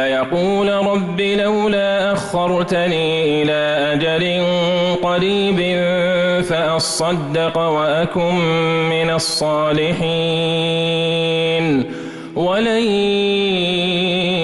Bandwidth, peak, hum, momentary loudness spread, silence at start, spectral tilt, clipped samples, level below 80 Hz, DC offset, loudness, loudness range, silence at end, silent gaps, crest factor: 12 kHz; -8 dBFS; none; 2 LU; 0 s; -5 dB/octave; under 0.1%; -48 dBFS; under 0.1%; -17 LUFS; 1 LU; 0 s; none; 10 dB